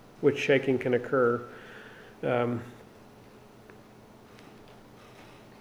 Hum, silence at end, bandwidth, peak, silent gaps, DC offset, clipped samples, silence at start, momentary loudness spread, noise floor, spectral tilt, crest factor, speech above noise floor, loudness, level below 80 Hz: none; 0.25 s; 19.5 kHz; -10 dBFS; none; under 0.1%; under 0.1%; 0.2 s; 26 LU; -53 dBFS; -6.5 dB/octave; 20 dB; 26 dB; -28 LUFS; -66 dBFS